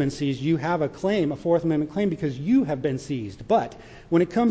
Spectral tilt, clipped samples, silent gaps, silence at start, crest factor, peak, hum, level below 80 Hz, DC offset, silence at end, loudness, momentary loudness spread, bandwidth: -7.5 dB/octave; under 0.1%; none; 0 s; 14 dB; -10 dBFS; none; -54 dBFS; under 0.1%; 0 s; -24 LUFS; 6 LU; 8 kHz